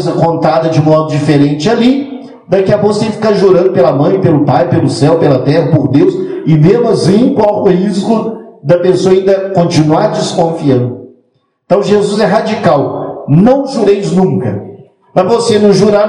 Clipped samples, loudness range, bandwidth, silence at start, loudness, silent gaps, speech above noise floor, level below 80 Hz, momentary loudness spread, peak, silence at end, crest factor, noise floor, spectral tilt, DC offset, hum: 0.9%; 2 LU; 10.5 kHz; 0 s; -10 LUFS; none; 48 dB; -46 dBFS; 6 LU; 0 dBFS; 0 s; 10 dB; -56 dBFS; -7 dB/octave; under 0.1%; none